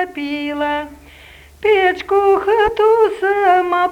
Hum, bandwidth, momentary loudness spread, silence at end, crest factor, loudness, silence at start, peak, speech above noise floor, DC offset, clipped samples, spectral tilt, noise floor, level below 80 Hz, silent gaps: none; 13 kHz; 9 LU; 0 s; 14 dB; -15 LUFS; 0 s; -2 dBFS; 27 dB; under 0.1%; under 0.1%; -4.5 dB/octave; -42 dBFS; -46 dBFS; none